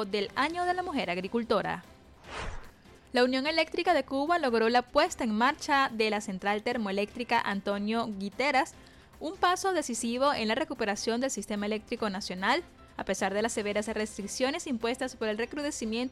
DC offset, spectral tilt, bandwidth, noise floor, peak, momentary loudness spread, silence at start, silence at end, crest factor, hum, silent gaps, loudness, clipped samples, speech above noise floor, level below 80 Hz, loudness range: under 0.1%; -3.5 dB/octave; 15 kHz; -52 dBFS; -12 dBFS; 9 LU; 0 s; 0 s; 18 dB; none; none; -30 LUFS; under 0.1%; 23 dB; -56 dBFS; 4 LU